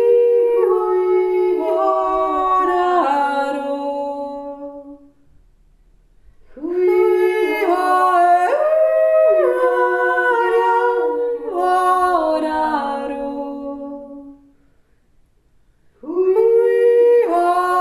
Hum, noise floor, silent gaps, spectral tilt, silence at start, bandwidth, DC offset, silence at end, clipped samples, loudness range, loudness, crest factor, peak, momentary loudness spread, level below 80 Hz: none; -55 dBFS; none; -4 dB/octave; 0 s; 13.5 kHz; under 0.1%; 0 s; under 0.1%; 11 LU; -16 LUFS; 14 dB; -4 dBFS; 14 LU; -54 dBFS